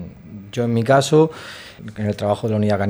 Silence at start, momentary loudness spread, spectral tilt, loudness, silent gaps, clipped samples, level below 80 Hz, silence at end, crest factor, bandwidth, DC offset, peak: 0 s; 20 LU; -6.5 dB/octave; -19 LUFS; none; under 0.1%; -54 dBFS; 0 s; 16 dB; over 20 kHz; under 0.1%; -2 dBFS